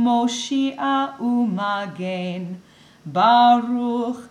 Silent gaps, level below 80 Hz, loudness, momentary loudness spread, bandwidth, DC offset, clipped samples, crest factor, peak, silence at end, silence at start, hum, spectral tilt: none; -70 dBFS; -20 LUFS; 15 LU; 10 kHz; under 0.1%; under 0.1%; 16 dB; -4 dBFS; 0.05 s; 0 s; none; -5 dB/octave